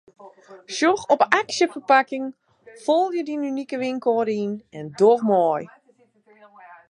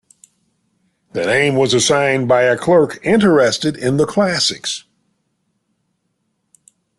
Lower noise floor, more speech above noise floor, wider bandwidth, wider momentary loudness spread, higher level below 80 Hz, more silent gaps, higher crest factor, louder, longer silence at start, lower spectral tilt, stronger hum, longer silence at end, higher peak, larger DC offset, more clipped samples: second, -60 dBFS vs -69 dBFS; second, 39 dB vs 55 dB; second, 11 kHz vs 12.5 kHz; first, 13 LU vs 10 LU; second, -72 dBFS vs -54 dBFS; neither; first, 22 dB vs 16 dB; second, -21 LUFS vs -15 LUFS; second, 0.2 s vs 1.15 s; about the same, -4.5 dB/octave vs -4 dB/octave; neither; second, 0.15 s vs 2.2 s; about the same, 0 dBFS vs -2 dBFS; neither; neither